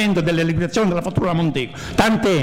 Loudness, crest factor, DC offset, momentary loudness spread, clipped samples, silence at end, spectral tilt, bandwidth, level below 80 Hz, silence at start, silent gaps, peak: -19 LUFS; 12 dB; under 0.1%; 5 LU; under 0.1%; 0 s; -6 dB/octave; 16 kHz; -40 dBFS; 0 s; none; -6 dBFS